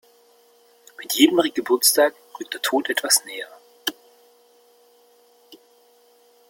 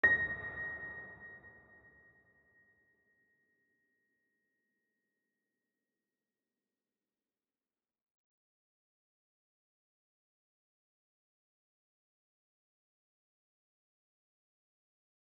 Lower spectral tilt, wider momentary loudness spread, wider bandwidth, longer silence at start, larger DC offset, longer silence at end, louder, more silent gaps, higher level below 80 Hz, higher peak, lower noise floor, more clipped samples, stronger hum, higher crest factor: second, -0.5 dB/octave vs -2.5 dB/octave; second, 18 LU vs 25 LU; first, 17 kHz vs 4 kHz; first, 1 s vs 0.05 s; neither; second, 0.95 s vs 13.7 s; first, -20 LUFS vs -36 LUFS; neither; about the same, -74 dBFS vs -72 dBFS; first, -2 dBFS vs -16 dBFS; second, -56 dBFS vs under -90 dBFS; neither; neither; second, 22 dB vs 30 dB